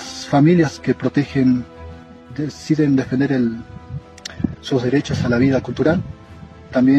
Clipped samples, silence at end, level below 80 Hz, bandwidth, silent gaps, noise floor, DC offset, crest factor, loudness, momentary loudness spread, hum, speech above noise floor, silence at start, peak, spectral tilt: under 0.1%; 0 s; -46 dBFS; 8.8 kHz; none; -39 dBFS; under 0.1%; 14 dB; -18 LUFS; 18 LU; none; 22 dB; 0 s; -4 dBFS; -7 dB/octave